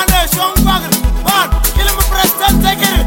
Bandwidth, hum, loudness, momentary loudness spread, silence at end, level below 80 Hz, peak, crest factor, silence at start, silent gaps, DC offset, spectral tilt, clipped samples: 17.5 kHz; none; -12 LUFS; 2 LU; 0 s; -16 dBFS; 0 dBFS; 12 dB; 0 s; none; under 0.1%; -3.5 dB/octave; under 0.1%